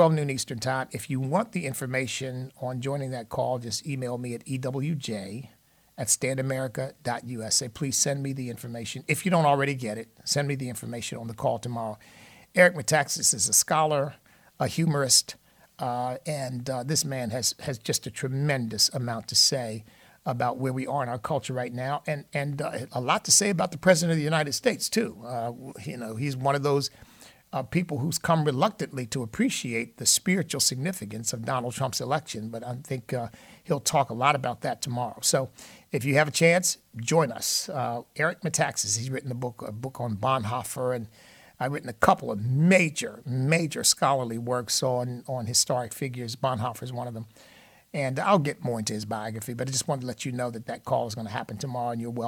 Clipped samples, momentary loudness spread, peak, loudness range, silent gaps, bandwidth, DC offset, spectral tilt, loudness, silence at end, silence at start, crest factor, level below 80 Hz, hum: under 0.1%; 14 LU; -4 dBFS; 6 LU; none; 19 kHz; under 0.1%; -3.5 dB/octave; -27 LUFS; 0 s; 0 s; 24 dB; -64 dBFS; none